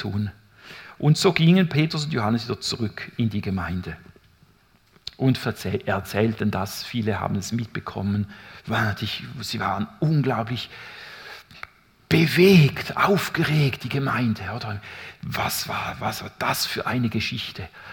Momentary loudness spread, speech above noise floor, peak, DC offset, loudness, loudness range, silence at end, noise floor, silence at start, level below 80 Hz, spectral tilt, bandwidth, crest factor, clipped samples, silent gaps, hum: 20 LU; 35 dB; -2 dBFS; under 0.1%; -23 LUFS; 7 LU; 0 s; -59 dBFS; 0 s; -56 dBFS; -5.5 dB/octave; 18 kHz; 22 dB; under 0.1%; none; none